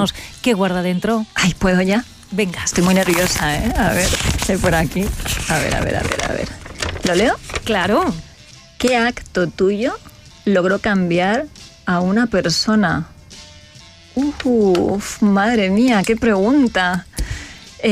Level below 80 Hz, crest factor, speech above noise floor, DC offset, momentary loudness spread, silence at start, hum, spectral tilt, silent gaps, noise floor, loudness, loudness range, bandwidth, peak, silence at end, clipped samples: -32 dBFS; 14 dB; 26 dB; under 0.1%; 10 LU; 0 s; none; -4.5 dB/octave; none; -43 dBFS; -17 LUFS; 3 LU; 15.5 kHz; -4 dBFS; 0 s; under 0.1%